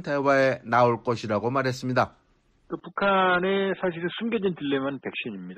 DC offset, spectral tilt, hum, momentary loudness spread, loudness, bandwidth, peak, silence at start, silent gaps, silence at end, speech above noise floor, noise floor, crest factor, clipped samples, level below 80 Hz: under 0.1%; -6 dB/octave; none; 11 LU; -25 LUFS; 13.5 kHz; -8 dBFS; 0 s; none; 0 s; 33 dB; -57 dBFS; 16 dB; under 0.1%; -62 dBFS